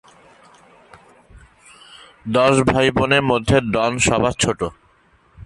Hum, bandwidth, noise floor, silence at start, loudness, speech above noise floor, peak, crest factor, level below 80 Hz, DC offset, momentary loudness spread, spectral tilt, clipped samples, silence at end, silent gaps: none; 11.5 kHz; -56 dBFS; 1.35 s; -17 LUFS; 39 dB; -2 dBFS; 18 dB; -40 dBFS; under 0.1%; 8 LU; -4.5 dB/octave; under 0.1%; 0 s; none